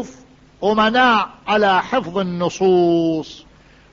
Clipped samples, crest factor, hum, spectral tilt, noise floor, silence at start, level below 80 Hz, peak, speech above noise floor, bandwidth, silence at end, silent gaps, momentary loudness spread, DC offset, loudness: under 0.1%; 14 dB; none; -5.5 dB/octave; -46 dBFS; 0 s; -52 dBFS; -4 dBFS; 29 dB; 7.6 kHz; 0.5 s; none; 9 LU; under 0.1%; -17 LUFS